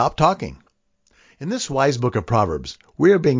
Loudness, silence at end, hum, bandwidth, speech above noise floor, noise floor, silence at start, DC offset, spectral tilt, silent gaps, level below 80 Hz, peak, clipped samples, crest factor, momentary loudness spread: -20 LUFS; 0 s; none; 7.6 kHz; 44 dB; -63 dBFS; 0 s; under 0.1%; -6 dB/octave; none; -44 dBFS; -2 dBFS; under 0.1%; 18 dB; 15 LU